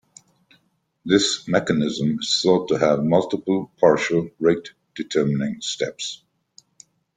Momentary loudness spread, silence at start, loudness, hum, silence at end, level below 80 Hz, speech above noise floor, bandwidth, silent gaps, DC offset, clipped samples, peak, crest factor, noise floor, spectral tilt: 11 LU; 1.05 s; -21 LUFS; none; 1 s; -60 dBFS; 45 dB; 9.6 kHz; none; under 0.1%; under 0.1%; -2 dBFS; 20 dB; -66 dBFS; -4.5 dB/octave